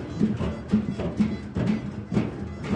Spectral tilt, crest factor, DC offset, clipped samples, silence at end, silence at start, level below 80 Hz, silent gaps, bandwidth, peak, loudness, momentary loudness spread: -8 dB/octave; 18 dB; under 0.1%; under 0.1%; 0 s; 0 s; -44 dBFS; none; 9 kHz; -10 dBFS; -28 LUFS; 4 LU